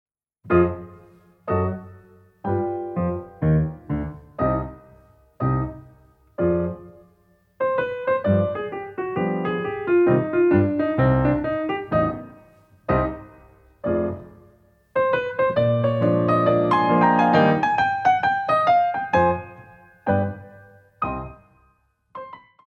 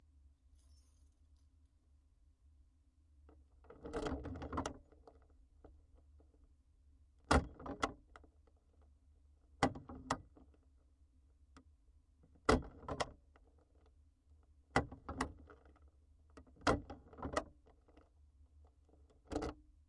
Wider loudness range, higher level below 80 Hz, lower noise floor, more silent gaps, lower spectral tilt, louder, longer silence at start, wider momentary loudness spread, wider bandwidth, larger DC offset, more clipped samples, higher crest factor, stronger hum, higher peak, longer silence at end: about the same, 8 LU vs 7 LU; first, -44 dBFS vs -56 dBFS; second, -63 dBFS vs -71 dBFS; neither; first, -9 dB/octave vs -5 dB/octave; first, -22 LUFS vs -41 LUFS; second, 0.45 s vs 3.25 s; second, 16 LU vs 23 LU; second, 7 kHz vs 11 kHz; neither; neither; second, 18 dB vs 32 dB; neither; first, -4 dBFS vs -14 dBFS; about the same, 0.3 s vs 0.35 s